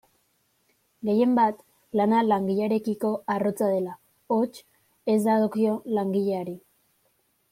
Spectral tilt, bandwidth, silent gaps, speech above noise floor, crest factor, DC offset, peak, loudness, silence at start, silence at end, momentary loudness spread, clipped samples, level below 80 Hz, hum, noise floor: -7.5 dB/octave; 15.5 kHz; none; 46 dB; 16 dB; under 0.1%; -10 dBFS; -25 LUFS; 1.05 s; 0.95 s; 11 LU; under 0.1%; -72 dBFS; none; -70 dBFS